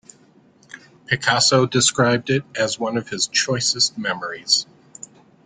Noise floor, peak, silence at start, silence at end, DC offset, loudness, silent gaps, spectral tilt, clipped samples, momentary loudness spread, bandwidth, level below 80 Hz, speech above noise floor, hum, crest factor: -53 dBFS; -2 dBFS; 0.75 s; 0.8 s; under 0.1%; -19 LUFS; none; -2.5 dB/octave; under 0.1%; 12 LU; 10 kHz; -60 dBFS; 33 dB; none; 20 dB